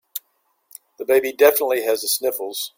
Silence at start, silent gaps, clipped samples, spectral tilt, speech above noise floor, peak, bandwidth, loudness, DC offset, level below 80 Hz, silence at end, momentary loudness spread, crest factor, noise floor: 0.15 s; none; under 0.1%; -0.5 dB/octave; 49 dB; -2 dBFS; 17 kHz; -19 LUFS; under 0.1%; -70 dBFS; 0.1 s; 17 LU; 18 dB; -68 dBFS